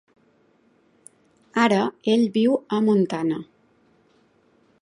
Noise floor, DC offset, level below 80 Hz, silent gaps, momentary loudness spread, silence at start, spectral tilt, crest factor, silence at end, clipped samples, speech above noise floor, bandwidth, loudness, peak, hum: -61 dBFS; under 0.1%; -72 dBFS; none; 8 LU; 1.55 s; -6.5 dB/octave; 20 dB; 1.4 s; under 0.1%; 41 dB; 11 kHz; -22 LUFS; -4 dBFS; none